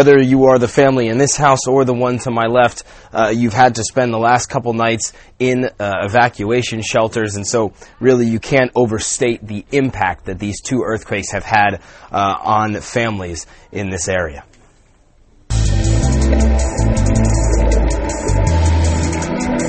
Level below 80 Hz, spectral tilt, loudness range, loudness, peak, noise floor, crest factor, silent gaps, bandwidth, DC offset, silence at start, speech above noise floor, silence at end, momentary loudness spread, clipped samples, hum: -22 dBFS; -5 dB/octave; 5 LU; -16 LUFS; 0 dBFS; -50 dBFS; 14 dB; none; 8.8 kHz; under 0.1%; 0 s; 35 dB; 0 s; 8 LU; under 0.1%; none